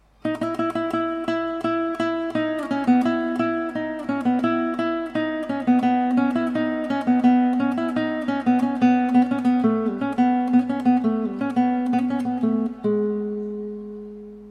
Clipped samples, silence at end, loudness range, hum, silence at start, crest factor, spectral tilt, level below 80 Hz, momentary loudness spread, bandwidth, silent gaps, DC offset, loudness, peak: under 0.1%; 0 s; 3 LU; none; 0.25 s; 14 dB; -7 dB/octave; -58 dBFS; 8 LU; 9.6 kHz; none; under 0.1%; -22 LUFS; -6 dBFS